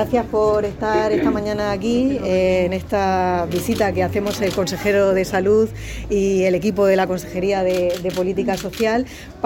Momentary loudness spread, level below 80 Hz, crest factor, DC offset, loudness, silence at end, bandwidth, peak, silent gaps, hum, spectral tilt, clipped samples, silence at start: 5 LU; -40 dBFS; 14 dB; under 0.1%; -19 LUFS; 0 s; 17 kHz; -4 dBFS; none; none; -6 dB/octave; under 0.1%; 0 s